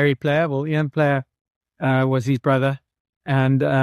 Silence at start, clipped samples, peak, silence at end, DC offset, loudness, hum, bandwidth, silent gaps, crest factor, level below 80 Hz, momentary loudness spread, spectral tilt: 0 s; under 0.1%; -4 dBFS; 0 s; under 0.1%; -20 LUFS; none; 11 kHz; 1.41-1.45 s, 1.56-1.61 s, 3.00-3.21 s; 16 dB; -58 dBFS; 7 LU; -8 dB/octave